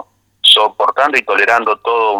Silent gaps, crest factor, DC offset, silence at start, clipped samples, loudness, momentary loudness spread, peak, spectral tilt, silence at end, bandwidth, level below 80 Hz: none; 14 dB; under 0.1%; 0.45 s; under 0.1%; -11 LUFS; 6 LU; 0 dBFS; -0.5 dB/octave; 0 s; 20 kHz; -62 dBFS